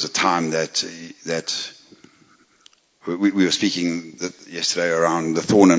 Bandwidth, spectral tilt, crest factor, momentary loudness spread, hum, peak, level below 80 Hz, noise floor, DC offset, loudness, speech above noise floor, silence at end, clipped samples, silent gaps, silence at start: 8 kHz; -3.5 dB/octave; 20 dB; 12 LU; none; -2 dBFS; -60 dBFS; -56 dBFS; under 0.1%; -21 LUFS; 36 dB; 0 s; under 0.1%; none; 0 s